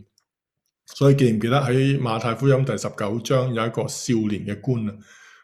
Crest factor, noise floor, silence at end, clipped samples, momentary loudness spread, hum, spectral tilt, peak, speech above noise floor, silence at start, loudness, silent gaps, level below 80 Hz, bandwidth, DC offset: 18 dB; -80 dBFS; 0.4 s; under 0.1%; 8 LU; none; -6.5 dB/octave; -4 dBFS; 59 dB; 0.9 s; -22 LUFS; none; -58 dBFS; 13.5 kHz; under 0.1%